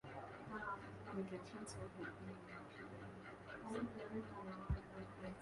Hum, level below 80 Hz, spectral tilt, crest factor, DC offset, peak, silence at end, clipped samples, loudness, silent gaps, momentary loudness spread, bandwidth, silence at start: none; -60 dBFS; -6.5 dB/octave; 20 dB; under 0.1%; -30 dBFS; 0 s; under 0.1%; -51 LUFS; none; 7 LU; 11.5 kHz; 0.05 s